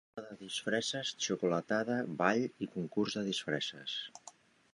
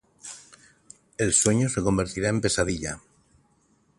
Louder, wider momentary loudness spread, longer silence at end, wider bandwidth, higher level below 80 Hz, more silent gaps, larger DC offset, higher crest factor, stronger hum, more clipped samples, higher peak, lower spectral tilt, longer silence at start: second, -35 LUFS vs -24 LUFS; second, 14 LU vs 21 LU; second, 0.45 s vs 1 s; about the same, 11.5 kHz vs 11.5 kHz; second, -78 dBFS vs -46 dBFS; neither; neither; about the same, 22 dB vs 24 dB; neither; neither; second, -14 dBFS vs -4 dBFS; about the same, -4 dB/octave vs -4 dB/octave; about the same, 0.15 s vs 0.25 s